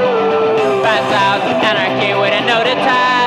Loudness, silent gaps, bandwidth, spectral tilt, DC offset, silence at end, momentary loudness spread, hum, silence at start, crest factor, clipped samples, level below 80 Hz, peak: -13 LUFS; none; 13.5 kHz; -4.5 dB/octave; under 0.1%; 0 s; 1 LU; none; 0 s; 10 dB; under 0.1%; -56 dBFS; -4 dBFS